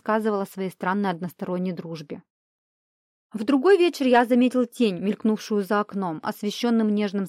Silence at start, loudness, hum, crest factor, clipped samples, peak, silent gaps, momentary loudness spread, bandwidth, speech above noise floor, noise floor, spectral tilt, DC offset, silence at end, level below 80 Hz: 0.05 s; -23 LUFS; none; 18 dB; under 0.1%; -6 dBFS; 2.30-3.30 s; 13 LU; 15.5 kHz; over 67 dB; under -90 dBFS; -6 dB/octave; under 0.1%; 0 s; -74 dBFS